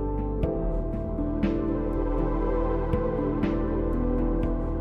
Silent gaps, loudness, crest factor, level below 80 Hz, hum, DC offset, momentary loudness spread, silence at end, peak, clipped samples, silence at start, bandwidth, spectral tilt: none; -28 LUFS; 14 dB; -30 dBFS; none; under 0.1%; 3 LU; 0 s; -12 dBFS; under 0.1%; 0 s; 4.4 kHz; -10.5 dB/octave